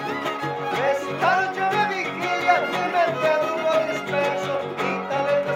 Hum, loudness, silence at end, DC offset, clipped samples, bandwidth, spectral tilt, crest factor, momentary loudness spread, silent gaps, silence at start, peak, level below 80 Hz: none; -23 LUFS; 0 s; under 0.1%; under 0.1%; 16.5 kHz; -4.5 dB/octave; 18 dB; 5 LU; none; 0 s; -6 dBFS; -72 dBFS